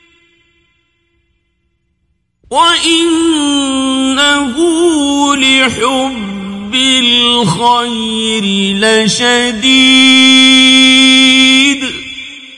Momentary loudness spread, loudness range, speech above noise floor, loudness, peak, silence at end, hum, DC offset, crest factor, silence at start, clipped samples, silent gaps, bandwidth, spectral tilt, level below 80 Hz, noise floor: 12 LU; 8 LU; 53 dB; -7 LUFS; 0 dBFS; 0 s; none; under 0.1%; 10 dB; 2.5 s; 0.3%; none; 11.5 kHz; -2.5 dB/octave; -46 dBFS; -62 dBFS